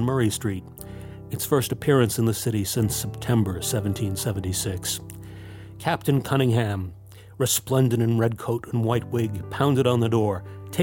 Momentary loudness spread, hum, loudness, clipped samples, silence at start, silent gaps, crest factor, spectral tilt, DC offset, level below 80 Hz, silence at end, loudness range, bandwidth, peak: 14 LU; none; -24 LUFS; under 0.1%; 0 s; none; 18 dB; -5.5 dB/octave; under 0.1%; -50 dBFS; 0 s; 3 LU; 17 kHz; -6 dBFS